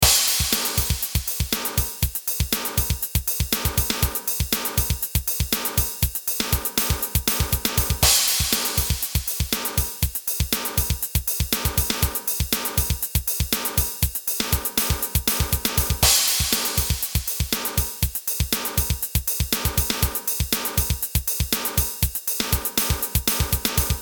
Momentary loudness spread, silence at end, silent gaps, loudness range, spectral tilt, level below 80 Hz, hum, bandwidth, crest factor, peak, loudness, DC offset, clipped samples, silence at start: 5 LU; 0 s; none; 3 LU; -2.5 dB/octave; -30 dBFS; none; over 20 kHz; 22 dB; -2 dBFS; -22 LUFS; under 0.1%; under 0.1%; 0 s